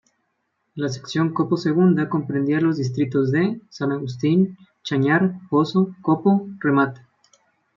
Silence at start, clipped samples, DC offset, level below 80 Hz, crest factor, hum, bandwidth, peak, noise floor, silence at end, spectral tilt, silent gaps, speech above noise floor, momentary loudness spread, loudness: 0.75 s; under 0.1%; under 0.1%; -66 dBFS; 16 dB; none; 7.4 kHz; -4 dBFS; -73 dBFS; 0.8 s; -7.5 dB/octave; none; 53 dB; 8 LU; -21 LUFS